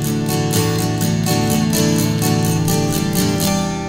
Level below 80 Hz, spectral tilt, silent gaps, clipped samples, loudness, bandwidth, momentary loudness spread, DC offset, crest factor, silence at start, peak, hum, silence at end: -38 dBFS; -5 dB/octave; none; under 0.1%; -17 LUFS; 16.5 kHz; 2 LU; under 0.1%; 16 dB; 0 s; 0 dBFS; none; 0 s